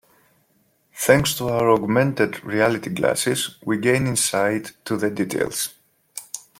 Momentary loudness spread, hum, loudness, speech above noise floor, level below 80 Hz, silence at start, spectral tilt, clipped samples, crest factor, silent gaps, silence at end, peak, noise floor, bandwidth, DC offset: 11 LU; none; -21 LUFS; 43 dB; -54 dBFS; 0.95 s; -4 dB/octave; under 0.1%; 20 dB; none; 0.2 s; -2 dBFS; -64 dBFS; 16.5 kHz; under 0.1%